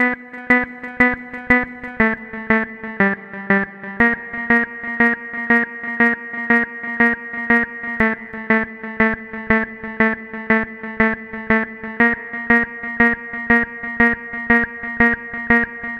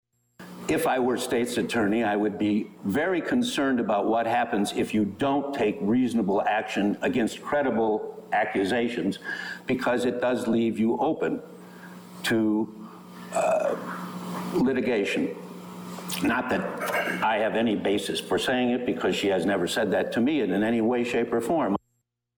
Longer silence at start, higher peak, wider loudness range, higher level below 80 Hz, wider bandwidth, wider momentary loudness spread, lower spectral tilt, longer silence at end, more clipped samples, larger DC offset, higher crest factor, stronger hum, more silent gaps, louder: second, 0 s vs 0.4 s; first, 0 dBFS vs -16 dBFS; about the same, 2 LU vs 3 LU; first, -44 dBFS vs -60 dBFS; second, 5.8 kHz vs over 20 kHz; about the same, 9 LU vs 9 LU; first, -7.5 dB/octave vs -5 dB/octave; second, 0 s vs 0.6 s; neither; neither; first, 20 dB vs 10 dB; neither; neither; first, -18 LUFS vs -26 LUFS